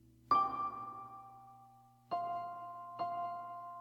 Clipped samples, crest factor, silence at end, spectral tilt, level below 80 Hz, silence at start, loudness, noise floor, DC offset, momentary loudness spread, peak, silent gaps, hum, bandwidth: under 0.1%; 22 dB; 0 s; -6 dB/octave; -74 dBFS; 0.05 s; -39 LUFS; -63 dBFS; under 0.1%; 21 LU; -20 dBFS; none; none; 17.5 kHz